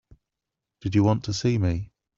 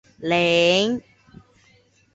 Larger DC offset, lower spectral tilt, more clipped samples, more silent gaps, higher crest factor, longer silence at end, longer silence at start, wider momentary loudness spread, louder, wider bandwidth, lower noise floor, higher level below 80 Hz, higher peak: neither; first, -6.5 dB/octave vs -4.5 dB/octave; neither; neither; about the same, 18 dB vs 18 dB; second, 0.35 s vs 1.15 s; first, 0.85 s vs 0.2 s; about the same, 10 LU vs 9 LU; second, -25 LUFS vs -19 LUFS; about the same, 7.8 kHz vs 8 kHz; first, -86 dBFS vs -58 dBFS; first, -48 dBFS vs -60 dBFS; about the same, -8 dBFS vs -6 dBFS